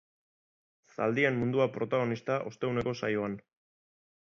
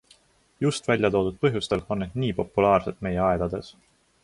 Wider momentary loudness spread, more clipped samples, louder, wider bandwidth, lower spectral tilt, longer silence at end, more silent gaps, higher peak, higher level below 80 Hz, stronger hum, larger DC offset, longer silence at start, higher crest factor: about the same, 7 LU vs 8 LU; neither; second, -31 LUFS vs -25 LUFS; second, 7.4 kHz vs 11.5 kHz; about the same, -7 dB/octave vs -6 dB/octave; first, 0.9 s vs 0.5 s; neither; second, -14 dBFS vs -6 dBFS; second, -64 dBFS vs -46 dBFS; neither; neither; first, 1 s vs 0.6 s; about the same, 20 dB vs 18 dB